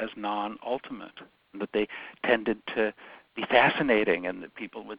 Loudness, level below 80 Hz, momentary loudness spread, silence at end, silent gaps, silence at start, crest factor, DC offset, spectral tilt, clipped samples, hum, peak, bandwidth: -27 LUFS; -60 dBFS; 19 LU; 0 s; none; 0 s; 26 dB; under 0.1%; -8.5 dB/octave; under 0.1%; none; -4 dBFS; 5.2 kHz